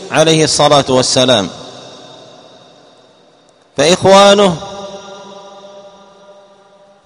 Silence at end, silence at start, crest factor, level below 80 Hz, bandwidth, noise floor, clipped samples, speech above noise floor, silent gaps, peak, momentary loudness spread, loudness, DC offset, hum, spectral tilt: 1.25 s; 0 s; 14 dB; -48 dBFS; 11.5 kHz; -48 dBFS; 0.4%; 39 dB; none; 0 dBFS; 25 LU; -9 LUFS; under 0.1%; none; -3.5 dB/octave